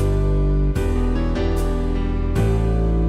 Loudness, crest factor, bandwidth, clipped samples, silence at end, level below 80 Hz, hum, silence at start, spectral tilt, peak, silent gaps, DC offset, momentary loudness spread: -21 LUFS; 10 dB; 12 kHz; under 0.1%; 0 s; -20 dBFS; none; 0 s; -8 dB/octave; -8 dBFS; none; under 0.1%; 3 LU